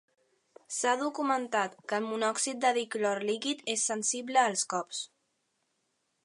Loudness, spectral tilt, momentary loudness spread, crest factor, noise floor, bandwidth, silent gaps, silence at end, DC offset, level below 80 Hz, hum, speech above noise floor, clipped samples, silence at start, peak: -30 LUFS; -1.5 dB/octave; 7 LU; 22 dB; -78 dBFS; 11.5 kHz; none; 1.2 s; under 0.1%; -88 dBFS; none; 48 dB; under 0.1%; 0.7 s; -10 dBFS